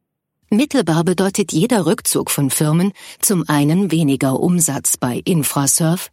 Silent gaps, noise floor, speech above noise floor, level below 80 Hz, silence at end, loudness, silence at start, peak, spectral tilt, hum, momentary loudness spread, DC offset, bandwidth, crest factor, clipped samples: none; -67 dBFS; 51 dB; -56 dBFS; 0.05 s; -16 LUFS; 0.5 s; -2 dBFS; -4.5 dB/octave; none; 3 LU; under 0.1%; 16.5 kHz; 14 dB; under 0.1%